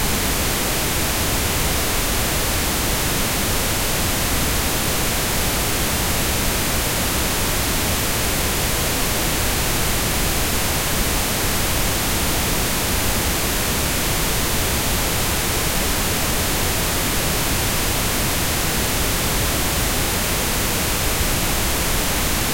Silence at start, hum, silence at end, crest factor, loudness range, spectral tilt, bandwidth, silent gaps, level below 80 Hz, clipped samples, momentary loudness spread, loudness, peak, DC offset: 0 s; none; 0 s; 16 dB; 0 LU; -2.5 dB/octave; 16.5 kHz; none; -28 dBFS; under 0.1%; 0 LU; -19 LUFS; -4 dBFS; under 0.1%